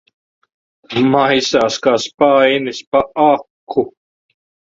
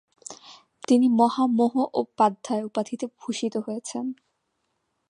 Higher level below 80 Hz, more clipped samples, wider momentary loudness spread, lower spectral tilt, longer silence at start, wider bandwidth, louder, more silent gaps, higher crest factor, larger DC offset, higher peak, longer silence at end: first, -54 dBFS vs -78 dBFS; neither; second, 8 LU vs 21 LU; about the same, -4.5 dB/octave vs -5 dB/octave; first, 0.9 s vs 0.3 s; second, 7.8 kHz vs 11 kHz; first, -15 LUFS vs -24 LUFS; first, 2.14-2.18 s, 2.87-2.92 s, 3.50-3.67 s vs none; about the same, 16 dB vs 18 dB; neither; first, 0 dBFS vs -6 dBFS; second, 0.8 s vs 0.95 s